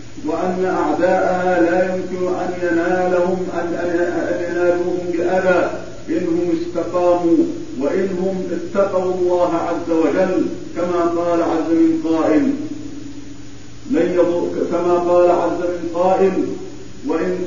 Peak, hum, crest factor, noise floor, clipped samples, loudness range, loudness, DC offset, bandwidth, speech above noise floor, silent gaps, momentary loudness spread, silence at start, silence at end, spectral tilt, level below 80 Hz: -2 dBFS; none; 16 dB; -37 dBFS; under 0.1%; 2 LU; -18 LUFS; 3%; 7.4 kHz; 20 dB; none; 9 LU; 0 s; 0 s; -6.5 dB/octave; -48 dBFS